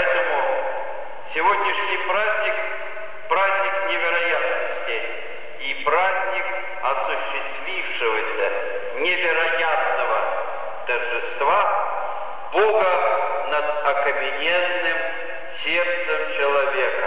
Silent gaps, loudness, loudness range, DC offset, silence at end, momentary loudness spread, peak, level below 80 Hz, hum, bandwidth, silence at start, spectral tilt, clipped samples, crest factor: none; -22 LUFS; 2 LU; 4%; 0 s; 9 LU; -8 dBFS; -70 dBFS; none; 4 kHz; 0 s; -5.5 dB/octave; under 0.1%; 14 dB